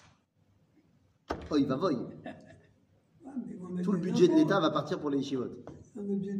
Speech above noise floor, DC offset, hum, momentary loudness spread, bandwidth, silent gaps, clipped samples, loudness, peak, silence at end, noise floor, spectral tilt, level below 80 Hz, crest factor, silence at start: 40 dB; under 0.1%; none; 18 LU; 9.8 kHz; none; under 0.1%; -30 LUFS; -12 dBFS; 0 s; -69 dBFS; -7 dB/octave; -62 dBFS; 20 dB; 1.3 s